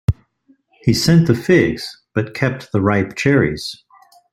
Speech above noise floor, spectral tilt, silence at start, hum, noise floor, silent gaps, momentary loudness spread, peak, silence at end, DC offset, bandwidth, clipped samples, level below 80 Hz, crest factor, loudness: 41 dB; -6 dB/octave; 0.1 s; none; -57 dBFS; none; 13 LU; -2 dBFS; 0.6 s; under 0.1%; 15.5 kHz; under 0.1%; -40 dBFS; 16 dB; -17 LUFS